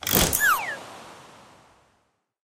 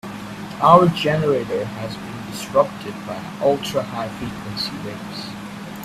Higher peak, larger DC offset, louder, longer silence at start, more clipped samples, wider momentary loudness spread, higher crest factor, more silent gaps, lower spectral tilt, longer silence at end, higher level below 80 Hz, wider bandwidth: second, -4 dBFS vs 0 dBFS; neither; about the same, -21 LUFS vs -21 LUFS; about the same, 0 s vs 0.05 s; neither; first, 24 LU vs 18 LU; about the same, 24 dB vs 20 dB; neither; second, -2 dB/octave vs -6 dB/octave; first, 1.35 s vs 0 s; first, -42 dBFS vs -52 dBFS; first, 17 kHz vs 15 kHz